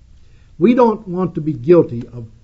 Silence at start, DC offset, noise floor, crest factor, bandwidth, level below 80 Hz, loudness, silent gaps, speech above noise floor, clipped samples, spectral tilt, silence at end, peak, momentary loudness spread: 0.6 s; under 0.1%; -44 dBFS; 16 dB; 6.4 kHz; -46 dBFS; -15 LUFS; none; 29 dB; under 0.1%; -10 dB/octave; 0.15 s; 0 dBFS; 12 LU